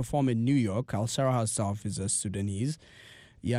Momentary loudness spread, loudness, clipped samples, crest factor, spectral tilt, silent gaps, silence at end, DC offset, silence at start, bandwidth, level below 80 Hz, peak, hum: 7 LU; -29 LUFS; under 0.1%; 14 dB; -5.5 dB/octave; none; 0 s; under 0.1%; 0 s; 15.5 kHz; -58 dBFS; -16 dBFS; none